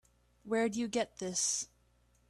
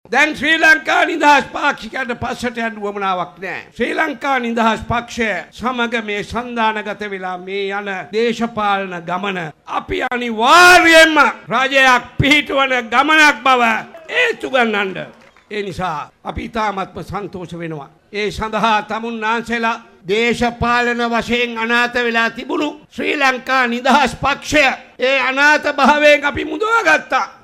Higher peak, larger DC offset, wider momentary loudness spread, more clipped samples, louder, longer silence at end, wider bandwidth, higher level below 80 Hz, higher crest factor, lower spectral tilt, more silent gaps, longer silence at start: second, -20 dBFS vs 0 dBFS; neither; second, 5 LU vs 14 LU; neither; second, -34 LUFS vs -15 LUFS; first, 0.65 s vs 0.1 s; second, 13.5 kHz vs 16 kHz; second, -70 dBFS vs -42 dBFS; about the same, 16 dB vs 16 dB; about the same, -2.5 dB/octave vs -3.5 dB/octave; neither; first, 0.45 s vs 0.1 s